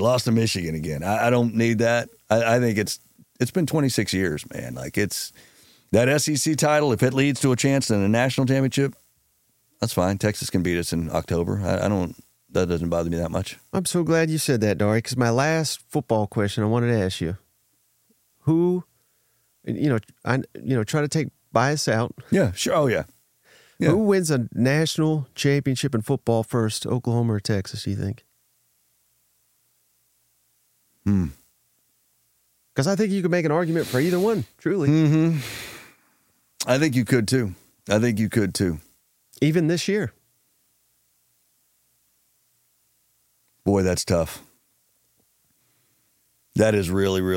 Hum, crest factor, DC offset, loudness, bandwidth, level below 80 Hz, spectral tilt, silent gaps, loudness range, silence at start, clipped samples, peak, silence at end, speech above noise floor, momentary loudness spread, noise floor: none; 20 dB; under 0.1%; -23 LUFS; 17 kHz; -52 dBFS; -5.5 dB/octave; none; 7 LU; 0 s; under 0.1%; -4 dBFS; 0 s; 45 dB; 9 LU; -66 dBFS